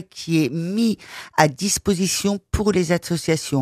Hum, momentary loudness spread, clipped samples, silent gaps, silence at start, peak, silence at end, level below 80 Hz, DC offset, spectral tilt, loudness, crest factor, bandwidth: none; 4 LU; under 0.1%; none; 0 s; 0 dBFS; 0 s; -40 dBFS; under 0.1%; -4.5 dB/octave; -21 LUFS; 20 dB; 15.5 kHz